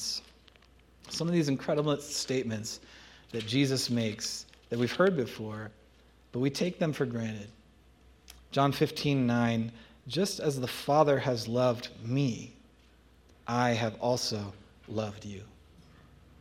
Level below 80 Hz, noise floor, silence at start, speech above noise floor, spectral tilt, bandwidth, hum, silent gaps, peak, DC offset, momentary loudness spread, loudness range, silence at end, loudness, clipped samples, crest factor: -62 dBFS; -60 dBFS; 0 s; 30 dB; -5 dB/octave; 16 kHz; none; none; -10 dBFS; under 0.1%; 15 LU; 5 LU; 0.6 s; -31 LUFS; under 0.1%; 22 dB